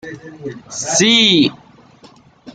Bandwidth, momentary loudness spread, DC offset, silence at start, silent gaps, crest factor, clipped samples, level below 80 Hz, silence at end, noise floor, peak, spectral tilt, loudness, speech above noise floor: 10 kHz; 21 LU; under 0.1%; 0.05 s; none; 16 dB; under 0.1%; -56 dBFS; 0.05 s; -46 dBFS; 0 dBFS; -2.5 dB/octave; -12 LUFS; 31 dB